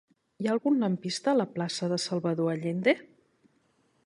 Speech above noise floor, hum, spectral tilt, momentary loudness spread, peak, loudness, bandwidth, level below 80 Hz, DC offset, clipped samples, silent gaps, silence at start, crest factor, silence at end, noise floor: 42 dB; none; -5.5 dB/octave; 5 LU; -10 dBFS; -29 LUFS; 11.5 kHz; -74 dBFS; under 0.1%; under 0.1%; none; 0.4 s; 20 dB; 1.05 s; -69 dBFS